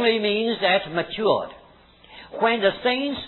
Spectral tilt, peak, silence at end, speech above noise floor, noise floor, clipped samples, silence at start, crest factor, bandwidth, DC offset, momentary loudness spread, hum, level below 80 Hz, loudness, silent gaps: -7 dB/octave; -6 dBFS; 0 s; 29 dB; -52 dBFS; under 0.1%; 0 s; 18 dB; 4.3 kHz; under 0.1%; 7 LU; none; -58 dBFS; -22 LUFS; none